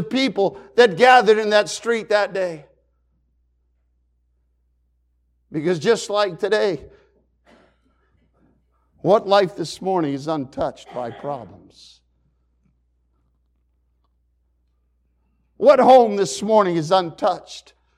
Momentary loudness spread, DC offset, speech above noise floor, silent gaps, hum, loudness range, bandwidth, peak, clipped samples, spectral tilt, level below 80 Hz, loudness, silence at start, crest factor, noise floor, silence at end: 18 LU; under 0.1%; 47 dB; none; none; 15 LU; 12.5 kHz; -2 dBFS; under 0.1%; -4.5 dB/octave; -60 dBFS; -18 LUFS; 0 s; 18 dB; -65 dBFS; 0.4 s